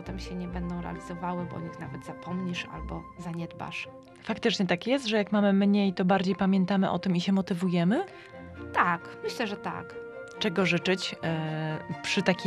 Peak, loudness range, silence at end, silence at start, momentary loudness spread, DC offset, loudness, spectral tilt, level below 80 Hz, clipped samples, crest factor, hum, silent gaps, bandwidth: -8 dBFS; 10 LU; 0 s; 0 s; 15 LU; under 0.1%; -29 LUFS; -6 dB/octave; -52 dBFS; under 0.1%; 22 dB; none; none; 11 kHz